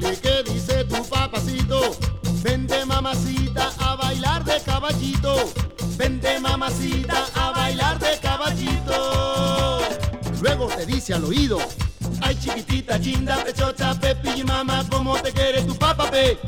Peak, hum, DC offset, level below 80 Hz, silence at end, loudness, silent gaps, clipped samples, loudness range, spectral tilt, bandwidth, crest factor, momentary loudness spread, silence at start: -6 dBFS; none; under 0.1%; -30 dBFS; 0 s; -22 LUFS; none; under 0.1%; 1 LU; -4.5 dB/octave; over 20 kHz; 16 dB; 4 LU; 0 s